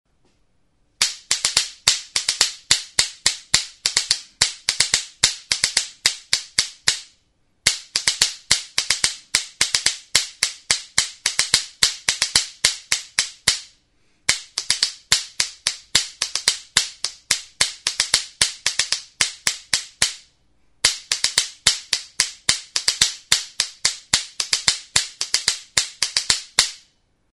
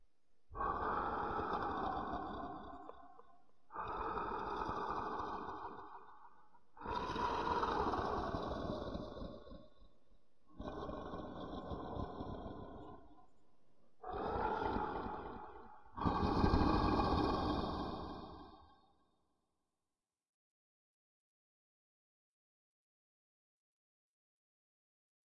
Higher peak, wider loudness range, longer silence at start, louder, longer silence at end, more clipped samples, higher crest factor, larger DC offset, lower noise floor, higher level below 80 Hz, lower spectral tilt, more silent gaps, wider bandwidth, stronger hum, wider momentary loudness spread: first, 0 dBFS vs -18 dBFS; second, 2 LU vs 11 LU; first, 1 s vs 0.5 s; first, -20 LUFS vs -41 LUFS; second, 0.55 s vs 0.95 s; neither; about the same, 24 dB vs 24 dB; second, under 0.1% vs 0.1%; second, -65 dBFS vs under -90 dBFS; about the same, -52 dBFS vs -54 dBFS; second, 1.5 dB/octave vs -7.5 dB/octave; second, none vs 20.29-20.51 s; first, over 20 kHz vs 11 kHz; neither; second, 5 LU vs 19 LU